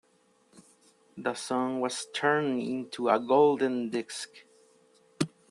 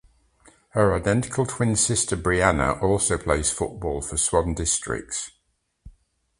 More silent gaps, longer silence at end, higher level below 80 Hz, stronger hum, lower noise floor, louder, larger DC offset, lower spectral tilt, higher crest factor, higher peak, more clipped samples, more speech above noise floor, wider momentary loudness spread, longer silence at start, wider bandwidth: neither; second, 0.25 s vs 0.5 s; second, -78 dBFS vs -38 dBFS; neither; second, -67 dBFS vs -71 dBFS; second, -29 LUFS vs -23 LUFS; neither; about the same, -4.5 dB/octave vs -4 dB/octave; about the same, 20 dB vs 24 dB; second, -10 dBFS vs -2 dBFS; neither; second, 38 dB vs 48 dB; first, 12 LU vs 8 LU; second, 0.55 s vs 0.75 s; about the same, 12.5 kHz vs 11.5 kHz